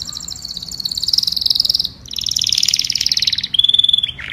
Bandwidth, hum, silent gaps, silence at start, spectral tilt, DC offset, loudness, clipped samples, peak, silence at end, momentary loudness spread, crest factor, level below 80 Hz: 16 kHz; none; none; 0 s; 1 dB/octave; under 0.1%; -14 LUFS; under 0.1%; 0 dBFS; 0 s; 14 LU; 18 dB; -46 dBFS